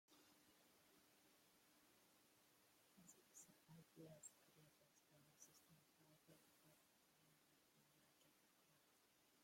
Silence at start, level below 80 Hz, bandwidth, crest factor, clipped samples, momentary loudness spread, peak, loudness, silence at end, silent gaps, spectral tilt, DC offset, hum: 0.1 s; under -90 dBFS; 16.5 kHz; 24 dB; under 0.1%; 6 LU; -48 dBFS; -67 LUFS; 0 s; none; -3 dB/octave; under 0.1%; none